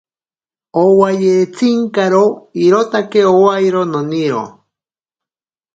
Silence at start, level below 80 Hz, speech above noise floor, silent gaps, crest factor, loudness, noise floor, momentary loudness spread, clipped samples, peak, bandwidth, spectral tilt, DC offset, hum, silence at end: 0.75 s; -62 dBFS; over 78 dB; none; 14 dB; -13 LUFS; under -90 dBFS; 7 LU; under 0.1%; 0 dBFS; 8 kHz; -6.5 dB/octave; under 0.1%; none; 1.25 s